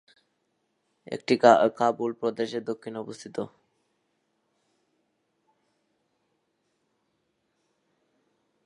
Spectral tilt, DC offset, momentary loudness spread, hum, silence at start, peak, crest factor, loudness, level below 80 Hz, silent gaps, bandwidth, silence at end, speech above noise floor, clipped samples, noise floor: -5 dB/octave; under 0.1%; 19 LU; none; 1.1 s; -2 dBFS; 28 dB; -24 LUFS; -80 dBFS; none; 11 kHz; 5.2 s; 51 dB; under 0.1%; -75 dBFS